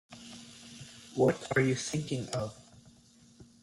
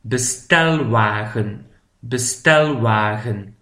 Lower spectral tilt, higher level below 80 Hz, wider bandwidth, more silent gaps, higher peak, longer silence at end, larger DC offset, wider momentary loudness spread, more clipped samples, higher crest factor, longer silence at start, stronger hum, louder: about the same, -5 dB/octave vs -4 dB/octave; second, -66 dBFS vs -52 dBFS; second, 14 kHz vs 15.5 kHz; neither; second, -14 dBFS vs 0 dBFS; about the same, 0.2 s vs 0.1 s; neither; first, 20 LU vs 12 LU; neither; about the same, 20 dB vs 18 dB; about the same, 0.1 s vs 0.05 s; neither; second, -31 LUFS vs -18 LUFS